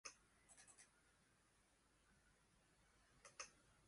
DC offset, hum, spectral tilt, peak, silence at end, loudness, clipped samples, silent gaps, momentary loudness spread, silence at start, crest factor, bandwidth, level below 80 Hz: under 0.1%; none; -0.5 dB/octave; -40 dBFS; 0 s; -62 LUFS; under 0.1%; none; 10 LU; 0.05 s; 28 dB; 11.5 kHz; -84 dBFS